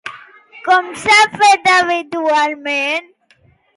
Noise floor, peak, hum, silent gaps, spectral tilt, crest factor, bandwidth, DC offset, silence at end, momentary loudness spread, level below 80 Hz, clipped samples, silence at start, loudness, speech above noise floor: -54 dBFS; -2 dBFS; none; none; -1.5 dB/octave; 14 dB; 11.5 kHz; under 0.1%; 0.75 s; 10 LU; -60 dBFS; under 0.1%; 0.05 s; -13 LUFS; 40 dB